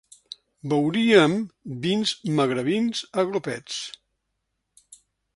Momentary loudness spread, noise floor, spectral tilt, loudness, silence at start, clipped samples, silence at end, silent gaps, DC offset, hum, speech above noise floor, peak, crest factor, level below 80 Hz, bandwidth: 19 LU; -78 dBFS; -5 dB/octave; -23 LUFS; 0.65 s; under 0.1%; 1.45 s; none; under 0.1%; none; 55 dB; -2 dBFS; 22 dB; -66 dBFS; 11.5 kHz